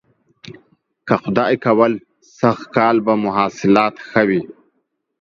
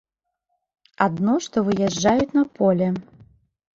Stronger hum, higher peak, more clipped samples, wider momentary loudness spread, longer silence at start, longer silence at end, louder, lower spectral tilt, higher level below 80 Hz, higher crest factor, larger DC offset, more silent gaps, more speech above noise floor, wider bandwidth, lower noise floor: neither; about the same, 0 dBFS vs -2 dBFS; neither; first, 7 LU vs 4 LU; second, 0.45 s vs 1 s; about the same, 0.7 s vs 0.75 s; first, -17 LUFS vs -21 LUFS; about the same, -7 dB/octave vs -6 dB/octave; about the same, -58 dBFS vs -54 dBFS; about the same, 18 dB vs 20 dB; neither; neither; about the same, 54 dB vs 57 dB; about the same, 7.4 kHz vs 7.8 kHz; second, -70 dBFS vs -77 dBFS